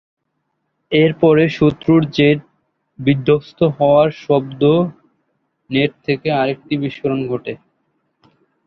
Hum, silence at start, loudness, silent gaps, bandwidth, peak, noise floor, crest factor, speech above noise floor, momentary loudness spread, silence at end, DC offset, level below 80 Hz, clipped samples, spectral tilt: none; 0.9 s; -16 LUFS; none; 6.4 kHz; 0 dBFS; -71 dBFS; 16 dB; 56 dB; 9 LU; 1.1 s; under 0.1%; -52 dBFS; under 0.1%; -8.5 dB/octave